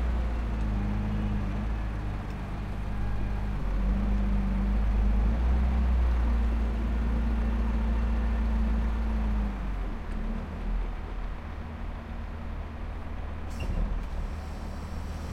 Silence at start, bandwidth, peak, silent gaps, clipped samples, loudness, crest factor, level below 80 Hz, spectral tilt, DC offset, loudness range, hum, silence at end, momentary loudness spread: 0 s; 6.4 kHz; -16 dBFS; none; under 0.1%; -32 LUFS; 12 dB; -28 dBFS; -8 dB/octave; under 0.1%; 9 LU; none; 0 s; 11 LU